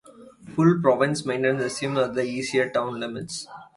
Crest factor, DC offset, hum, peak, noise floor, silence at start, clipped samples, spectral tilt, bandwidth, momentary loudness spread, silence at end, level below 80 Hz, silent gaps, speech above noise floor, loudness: 20 dB; under 0.1%; none; -4 dBFS; -46 dBFS; 0.2 s; under 0.1%; -5.5 dB/octave; 11.5 kHz; 13 LU; 0.15 s; -64 dBFS; none; 22 dB; -24 LUFS